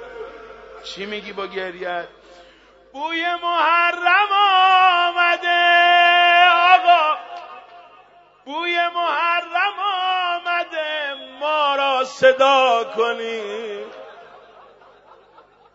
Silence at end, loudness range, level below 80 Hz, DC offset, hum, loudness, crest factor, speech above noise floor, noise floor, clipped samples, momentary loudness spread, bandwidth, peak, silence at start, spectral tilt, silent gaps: 1.5 s; 9 LU; -66 dBFS; under 0.1%; 50 Hz at -70 dBFS; -17 LUFS; 18 dB; 33 dB; -51 dBFS; under 0.1%; 19 LU; 8 kHz; 0 dBFS; 0 s; -2 dB/octave; none